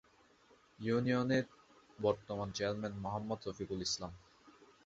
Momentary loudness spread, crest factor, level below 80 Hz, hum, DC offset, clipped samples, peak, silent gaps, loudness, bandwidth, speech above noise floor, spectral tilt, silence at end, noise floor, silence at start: 9 LU; 20 dB; -64 dBFS; none; under 0.1%; under 0.1%; -18 dBFS; none; -38 LUFS; 8 kHz; 30 dB; -5 dB/octave; 0.2 s; -67 dBFS; 0.8 s